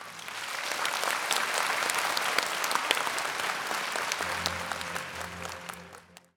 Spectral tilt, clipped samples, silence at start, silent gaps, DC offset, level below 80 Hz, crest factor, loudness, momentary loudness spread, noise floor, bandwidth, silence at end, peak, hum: -0.5 dB/octave; under 0.1%; 0 s; none; under 0.1%; -70 dBFS; 28 dB; -30 LUFS; 11 LU; -52 dBFS; over 20 kHz; 0.2 s; -4 dBFS; none